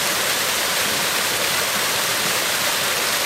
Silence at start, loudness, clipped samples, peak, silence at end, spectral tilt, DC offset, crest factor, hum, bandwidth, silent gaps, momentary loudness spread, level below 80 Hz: 0 s; -18 LUFS; under 0.1%; -6 dBFS; 0 s; 0 dB/octave; under 0.1%; 14 dB; none; 16.5 kHz; none; 0 LU; -56 dBFS